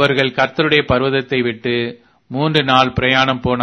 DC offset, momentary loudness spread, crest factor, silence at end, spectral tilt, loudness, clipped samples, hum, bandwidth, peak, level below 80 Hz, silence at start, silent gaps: under 0.1%; 7 LU; 16 dB; 0 s; -6 dB/octave; -15 LUFS; under 0.1%; none; 11 kHz; 0 dBFS; -42 dBFS; 0 s; none